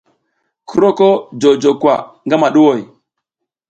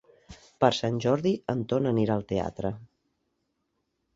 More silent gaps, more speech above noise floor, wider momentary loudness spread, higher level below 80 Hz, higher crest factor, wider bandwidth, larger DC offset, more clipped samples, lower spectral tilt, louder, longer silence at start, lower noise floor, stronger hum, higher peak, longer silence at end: neither; first, 66 dB vs 51 dB; about the same, 8 LU vs 9 LU; about the same, -60 dBFS vs -56 dBFS; second, 14 dB vs 24 dB; first, 8.8 kHz vs 7.8 kHz; neither; neither; about the same, -6 dB/octave vs -6.5 dB/octave; first, -13 LUFS vs -27 LUFS; first, 0.7 s vs 0.3 s; about the same, -78 dBFS vs -78 dBFS; neither; first, 0 dBFS vs -6 dBFS; second, 0.85 s vs 1.3 s